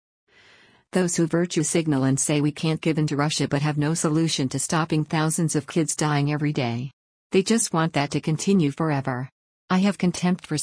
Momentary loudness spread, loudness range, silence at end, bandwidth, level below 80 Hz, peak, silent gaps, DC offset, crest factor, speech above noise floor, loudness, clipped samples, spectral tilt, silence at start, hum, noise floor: 4 LU; 1 LU; 0 s; 10.5 kHz; -60 dBFS; -8 dBFS; 6.93-7.30 s, 9.32-9.68 s; under 0.1%; 16 dB; 33 dB; -23 LUFS; under 0.1%; -5 dB/octave; 0.95 s; none; -55 dBFS